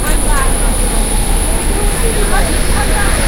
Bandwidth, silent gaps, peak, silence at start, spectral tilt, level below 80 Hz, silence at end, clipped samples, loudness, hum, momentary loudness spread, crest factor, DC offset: 16 kHz; none; 0 dBFS; 0 s; -3.5 dB/octave; -14 dBFS; 0 s; under 0.1%; -14 LUFS; none; 1 LU; 12 dB; under 0.1%